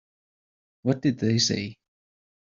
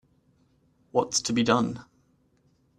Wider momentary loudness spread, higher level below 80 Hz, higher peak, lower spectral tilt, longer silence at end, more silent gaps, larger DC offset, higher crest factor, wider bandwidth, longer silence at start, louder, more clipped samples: about the same, 9 LU vs 8 LU; about the same, -64 dBFS vs -64 dBFS; about the same, -8 dBFS vs -6 dBFS; about the same, -4.5 dB/octave vs -4 dB/octave; second, 0.8 s vs 0.95 s; neither; neither; about the same, 20 dB vs 24 dB; second, 7.6 kHz vs 12.5 kHz; about the same, 0.85 s vs 0.95 s; about the same, -25 LUFS vs -26 LUFS; neither